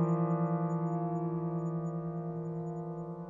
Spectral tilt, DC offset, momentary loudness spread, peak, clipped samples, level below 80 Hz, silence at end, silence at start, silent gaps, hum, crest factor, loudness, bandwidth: -11.5 dB/octave; under 0.1%; 8 LU; -20 dBFS; under 0.1%; -68 dBFS; 0 s; 0 s; none; none; 14 dB; -35 LUFS; 7.2 kHz